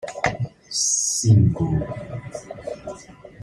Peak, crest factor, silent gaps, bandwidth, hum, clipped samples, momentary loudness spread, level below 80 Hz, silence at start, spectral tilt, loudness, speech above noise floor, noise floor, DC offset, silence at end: -4 dBFS; 18 dB; none; 14.5 kHz; none; under 0.1%; 18 LU; -46 dBFS; 0 s; -4.5 dB/octave; -20 LUFS; 23 dB; -42 dBFS; under 0.1%; 0 s